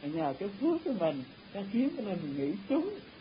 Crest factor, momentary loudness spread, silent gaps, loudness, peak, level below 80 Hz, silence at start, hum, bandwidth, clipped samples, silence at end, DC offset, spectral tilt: 16 dB; 8 LU; none; -34 LUFS; -18 dBFS; -68 dBFS; 0 s; none; 5.2 kHz; under 0.1%; 0 s; under 0.1%; -10.5 dB/octave